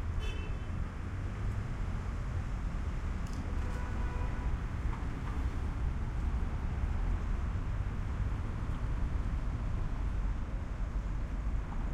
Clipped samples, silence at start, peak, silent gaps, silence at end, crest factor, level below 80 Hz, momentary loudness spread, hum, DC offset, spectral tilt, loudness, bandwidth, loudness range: under 0.1%; 0 s; -22 dBFS; none; 0 s; 12 dB; -36 dBFS; 3 LU; none; under 0.1%; -7.5 dB/octave; -38 LUFS; 9.4 kHz; 2 LU